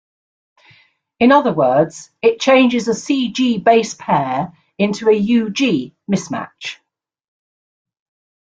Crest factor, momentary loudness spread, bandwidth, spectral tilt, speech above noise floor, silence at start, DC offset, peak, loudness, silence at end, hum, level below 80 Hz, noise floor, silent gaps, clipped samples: 16 dB; 12 LU; 9 kHz; -5 dB/octave; 38 dB; 1.2 s; under 0.1%; -2 dBFS; -16 LUFS; 1.65 s; none; -58 dBFS; -53 dBFS; none; under 0.1%